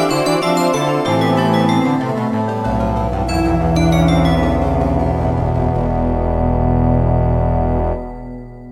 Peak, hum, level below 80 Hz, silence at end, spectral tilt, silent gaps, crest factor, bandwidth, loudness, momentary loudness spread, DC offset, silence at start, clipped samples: -2 dBFS; none; -24 dBFS; 0 s; -7 dB/octave; none; 14 dB; 15 kHz; -16 LUFS; 5 LU; under 0.1%; 0 s; under 0.1%